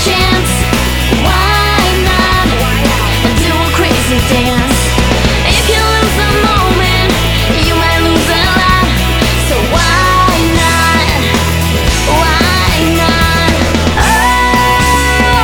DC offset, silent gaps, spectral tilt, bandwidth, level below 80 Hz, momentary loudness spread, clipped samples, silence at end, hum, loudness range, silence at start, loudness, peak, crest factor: under 0.1%; none; -4 dB/octave; over 20 kHz; -18 dBFS; 3 LU; 0.2%; 0 s; none; 1 LU; 0 s; -9 LUFS; 0 dBFS; 10 dB